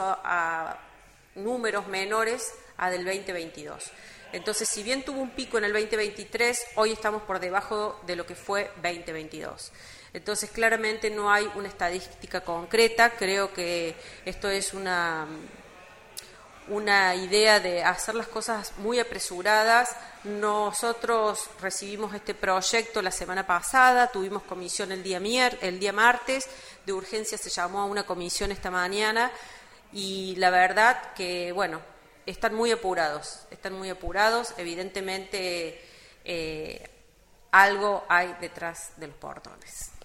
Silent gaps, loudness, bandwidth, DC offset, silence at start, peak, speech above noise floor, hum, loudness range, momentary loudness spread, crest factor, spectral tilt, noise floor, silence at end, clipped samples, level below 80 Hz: none; -26 LUFS; 16 kHz; under 0.1%; 0 s; -2 dBFS; 30 dB; none; 6 LU; 18 LU; 24 dB; -2 dB/octave; -57 dBFS; 0 s; under 0.1%; -54 dBFS